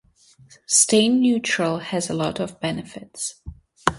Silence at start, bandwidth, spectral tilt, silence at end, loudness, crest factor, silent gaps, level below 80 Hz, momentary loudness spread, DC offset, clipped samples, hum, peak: 0.7 s; 11.5 kHz; -3 dB/octave; 0 s; -21 LUFS; 22 dB; none; -50 dBFS; 14 LU; under 0.1%; under 0.1%; none; 0 dBFS